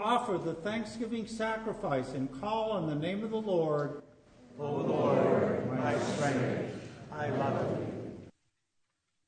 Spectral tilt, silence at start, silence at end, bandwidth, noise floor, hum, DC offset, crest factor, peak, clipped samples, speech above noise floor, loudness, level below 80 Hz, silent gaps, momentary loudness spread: -6.5 dB/octave; 0 s; 1 s; 9.6 kHz; -79 dBFS; none; under 0.1%; 18 dB; -14 dBFS; under 0.1%; 48 dB; -33 LUFS; -64 dBFS; none; 12 LU